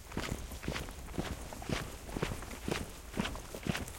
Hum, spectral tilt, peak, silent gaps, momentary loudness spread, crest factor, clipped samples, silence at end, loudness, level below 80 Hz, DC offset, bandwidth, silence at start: none; -4.5 dB/octave; -16 dBFS; none; 4 LU; 24 dB; under 0.1%; 0 s; -40 LUFS; -48 dBFS; under 0.1%; 17 kHz; 0 s